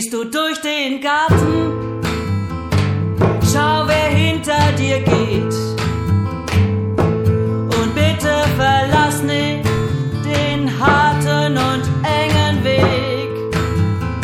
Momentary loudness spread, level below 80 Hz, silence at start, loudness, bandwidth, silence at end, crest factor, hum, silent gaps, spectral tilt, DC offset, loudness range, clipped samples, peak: 6 LU; -34 dBFS; 0 s; -16 LUFS; 15.5 kHz; 0 s; 14 dB; none; none; -5.5 dB/octave; under 0.1%; 2 LU; under 0.1%; -2 dBFS